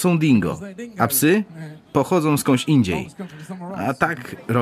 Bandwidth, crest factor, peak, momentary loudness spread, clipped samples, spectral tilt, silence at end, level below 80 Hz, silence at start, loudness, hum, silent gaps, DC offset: 15.5 kHz; 18 dB; -2 dBFS; 17 LU; under 0.1%; -5.5 dB/octave; 0 s; -52 dBFS; 0 s; -20 LUFS; none; none; under 0.1%